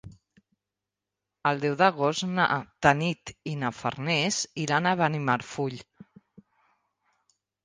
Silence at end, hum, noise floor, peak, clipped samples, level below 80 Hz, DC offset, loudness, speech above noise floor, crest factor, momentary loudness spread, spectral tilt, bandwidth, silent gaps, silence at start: 1.85 s; none; -88 dBFS; -4 dBFS; under 0.1%; -62 dBFS; under 0.1%; -26 LUFS; 61 dB; 26 dB; 10 LU; -4.5 dB/octave; 10 kHz; none; 0.05 s